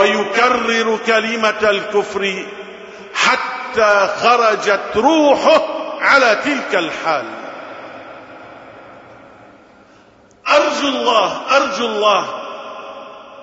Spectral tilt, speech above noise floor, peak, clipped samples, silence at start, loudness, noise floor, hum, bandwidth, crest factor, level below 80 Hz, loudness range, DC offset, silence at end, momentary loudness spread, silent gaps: -2.5 dB/octave; 33 dB; 0 dBFS; under 0.1%; 0 s; -15 LUFS; -48 dBFS; none; 8 kHz; 16 dB; -56 dBFS; 10 LU; under 0.1%; 0 s; 20 LU; none